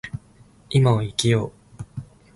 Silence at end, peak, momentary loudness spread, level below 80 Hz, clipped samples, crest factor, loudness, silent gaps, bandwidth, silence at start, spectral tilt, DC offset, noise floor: 0.35 s; -6 dBFS; 20 LU; -50 dBFS; under 0.1%; 18 dB; -21 LUFS; none; 11.5 kHz; 0.05 s; -6 dB/octave; under 0.1%; -52 dBFS